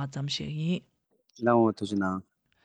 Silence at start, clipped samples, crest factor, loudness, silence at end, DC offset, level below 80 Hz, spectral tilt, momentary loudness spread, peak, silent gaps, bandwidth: 0 s; under 0.1%; 18 dB; -29 LUFS; 0.45 s; under 0.1%; -66 dBFS; -6.5 dB/octave; 9 LU; -12 dBFS; none; 10 kHz